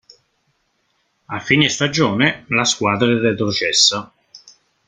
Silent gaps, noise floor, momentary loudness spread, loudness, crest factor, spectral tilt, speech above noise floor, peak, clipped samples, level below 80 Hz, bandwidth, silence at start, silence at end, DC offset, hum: none; -66 dBFS; 7 LU; -16 LUFS; 18 dB; -3 dB/octave; 49 dB; 0 dBFS; under 0.1%; -56 dBFS; 11 kHz; 1.3 s; 0.5 s; under 0.1%; none